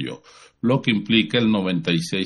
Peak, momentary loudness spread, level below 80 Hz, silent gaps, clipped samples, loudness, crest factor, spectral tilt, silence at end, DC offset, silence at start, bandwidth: -4 dBFS; 10 LU; -58 dBFS; none; under 0.1%; -20 LUFS; 18 dB; -5.5 dB/octave; 0 s; under 0.1%; 0 s; 11 kHz